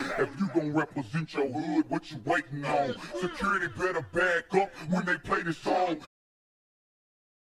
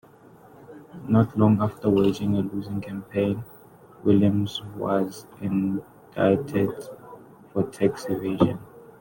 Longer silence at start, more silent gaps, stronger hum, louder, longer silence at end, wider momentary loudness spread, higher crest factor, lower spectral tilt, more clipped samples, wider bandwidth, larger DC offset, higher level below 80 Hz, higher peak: second, 0 s vs 0.6 s; neither; neither; second, -30 LUFS vs -24 LUFS; first, 1.5 s vs 0.15 s; second, 6 LU vs 16 LU; about the same, 18 dB vs 20 dB; second, -6 dB/octave vs -8 dB/octave; neither; second, 12.5 kHz vs 17 kHz; neither; about the same, -60 dBFS vs -58 dBFS; second, -12 dBFS vs -6 dBFS